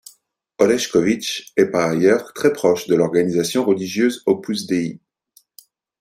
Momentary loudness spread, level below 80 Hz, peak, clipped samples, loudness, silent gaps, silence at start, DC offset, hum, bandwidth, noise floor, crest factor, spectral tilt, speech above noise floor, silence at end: 5 LU; -60 dBFS; -2 dBFS; under 0.1%; -19 LUFS; none; 0.6 s; under 0.1%; none; 16 kHz; -58 dBFS; 18 dB; -5 dB/octave; 40 dB; 1.05 s